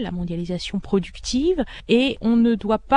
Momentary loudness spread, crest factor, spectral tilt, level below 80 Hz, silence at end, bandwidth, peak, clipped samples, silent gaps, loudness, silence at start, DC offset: 8 LU; 18 dB; -5.5 dB/octave; -40 dBFS; 0 s; 10 kHz; -4 dBFS; under 0.1%; none; -22 LUFS; 0 s; under 0.1%